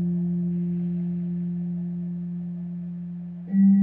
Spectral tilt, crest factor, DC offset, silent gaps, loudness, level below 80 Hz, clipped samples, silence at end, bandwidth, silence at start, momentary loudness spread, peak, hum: -13.5 dB/octave; 14 dB; under 0.1%; none; -28 LUFS; -62 dBFS; under 0.1%; 0 s; 2.1 kHz; 0 s; 10 LU; -12 dBFS; none